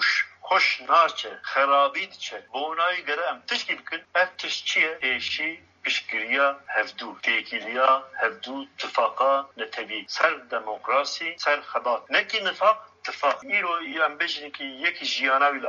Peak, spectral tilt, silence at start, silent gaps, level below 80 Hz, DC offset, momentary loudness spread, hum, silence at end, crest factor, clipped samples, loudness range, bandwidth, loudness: -4 dBFS; 2.5 dB/octave; 0 s; none; -78 dBFS; under 0.1%; 10 LU; none; 0 s; 20 dB; under 0.1%; 2 LU; 7.6 kHz; -24 LUFS